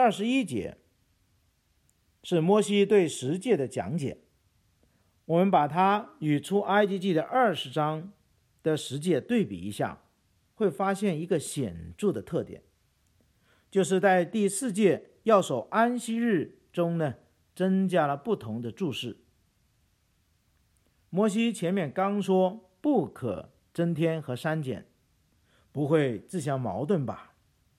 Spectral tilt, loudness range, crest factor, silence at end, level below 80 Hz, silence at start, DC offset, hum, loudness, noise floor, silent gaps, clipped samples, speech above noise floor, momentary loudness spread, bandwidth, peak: -6 dB/octave; 5 LU; 20 dB; 0.55 s; -66 dBFS; 0 s; under 0.1%; none; -28 LUFS; -70 dBFS; none; under 0.1%; 43 dB; 11 LU; 14 kHz; -10 dBFS